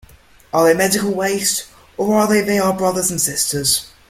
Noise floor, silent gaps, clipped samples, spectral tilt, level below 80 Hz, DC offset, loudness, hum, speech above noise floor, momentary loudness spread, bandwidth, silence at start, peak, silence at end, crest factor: -46 dBFS; none; under 0.1%; -3 dB/octave; -50 dBFS; under 0.1%; -16 LUFS; none; 30 dB; 7 LU; 16.5 kHz; 0.55 s; -2 dBFS; 0.2 s; 16 dB